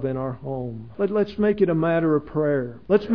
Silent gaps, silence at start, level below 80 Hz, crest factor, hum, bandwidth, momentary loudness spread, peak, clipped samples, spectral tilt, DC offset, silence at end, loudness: none; 0 s; -52 dBFS; 18 dB; none; 5.4 kHz; 10 LU; -6 dBFS; under 0.1%; -10.5 dB/octave; 0.4%; 0 s; -23 LUFS